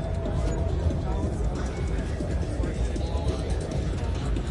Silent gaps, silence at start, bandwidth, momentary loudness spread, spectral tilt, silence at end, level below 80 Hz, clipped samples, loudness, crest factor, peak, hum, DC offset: none; 0 s; 11 kHz; 2 LU; -7 dB/octave; 0 s; -30 dBFS; under 0.1%; -29 LUFS; 12 dB; -14 dBFS; none; under 0.1%